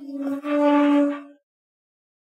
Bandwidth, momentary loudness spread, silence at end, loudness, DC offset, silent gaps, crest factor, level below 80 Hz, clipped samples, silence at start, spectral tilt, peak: 7.2 kHz; 11 LU; 1.1 s; -21 LUFS; under 0.1%; none; 16 dB; under -90 dBFS; under 0.1%; 0 s; -5 dB/octave; -8 dBFS